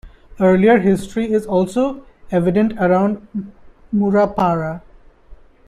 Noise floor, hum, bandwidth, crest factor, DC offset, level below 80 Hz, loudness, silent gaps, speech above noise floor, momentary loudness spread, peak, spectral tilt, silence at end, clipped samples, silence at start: -43 dBFS; none; 12 kHz; 16 dB; under 0.1%; -44 dBFS; -17 LUFS; none; 27 dB; 15 LU; -2 dBFS; -8 dB/octave; 0.35 s; under 0.1%; 0.05 s